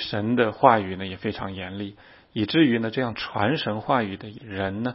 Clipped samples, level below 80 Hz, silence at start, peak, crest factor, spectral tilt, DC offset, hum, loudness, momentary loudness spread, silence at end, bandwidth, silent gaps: under 0.1%; -58 dBFS; 0 s; 0 dBFS; 24 dB; -10 dB/octave; under 0.1%; none; -24 LUFS; 16 LU; 0 s; 5.8 kHz; none